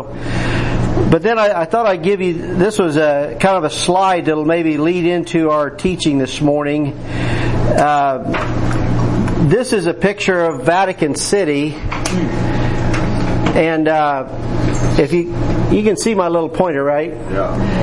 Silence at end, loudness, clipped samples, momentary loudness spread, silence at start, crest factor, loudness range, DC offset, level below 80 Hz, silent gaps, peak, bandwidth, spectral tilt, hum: 0 s; -16 LUFS; under 0.1%; 5 LU; 0 s; 14 dB; 2 LU; under 0.1%; -26 dBFS; none; 0 dBFS; 11.5 kHz; -6 dB/octave; none